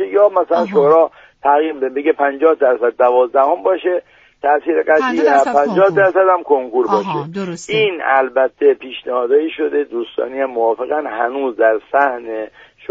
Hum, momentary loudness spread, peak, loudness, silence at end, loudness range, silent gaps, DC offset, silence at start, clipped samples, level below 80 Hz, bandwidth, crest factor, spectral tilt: none; 10 LU; 0 dBFS; -15 LUFS; 0.45 s; 4 LU; none; under 0.1%; 0 s; under 0.1%; -62 dBFS; 8 kHz; 14 dB; -5.5 dB/octave